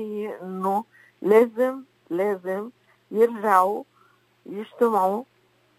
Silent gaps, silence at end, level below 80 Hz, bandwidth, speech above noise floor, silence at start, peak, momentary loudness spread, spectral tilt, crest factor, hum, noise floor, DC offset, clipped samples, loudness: none; 0.55 s; -82 dBFS; 16 kHz; 38 dB; 0 s; -4 dBFS; 16 LU; -6.5 dB/octave; 20 dB; none; -61 dBFS; under 0.1%; under 0.1%; -23 LUFS